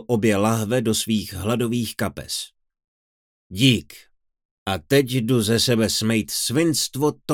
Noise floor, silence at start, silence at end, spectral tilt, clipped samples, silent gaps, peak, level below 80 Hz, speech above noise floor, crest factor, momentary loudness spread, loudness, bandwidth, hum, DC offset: under -90 dBFS; 0 s; 0 s; -4.5 dB/octave; under 0.1%; 2.88-3.50 s, 4.45-4.66 s; -2 dBFS; -56 dBFS; over 69 dB; 20 dB; 10 LU; -21 LUFS; 19 kHz; none; under 0.1%